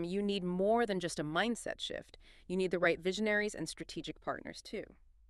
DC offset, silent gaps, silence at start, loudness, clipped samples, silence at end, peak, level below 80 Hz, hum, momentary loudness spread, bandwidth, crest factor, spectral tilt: under 0.1%; none; 0 s; -35 LUFS; under 0.1%; 0.35 s; -16 dBFS; -62 dBFS; none; 13 LU; 13 kHz; 20 dB; -4.5 dB/octave